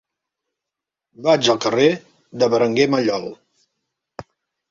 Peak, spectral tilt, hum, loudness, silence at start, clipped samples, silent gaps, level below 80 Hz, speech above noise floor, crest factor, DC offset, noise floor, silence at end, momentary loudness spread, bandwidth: -2 dBFS; -4.5 dB/octave; none; -18 LUFS; 1.2 s; under 0.1%; none; -62 dBFS; 68 dB; 18 dB; under 0.1%; -85 dBFS; 0.5 s; 12 LU; 7.6 kHz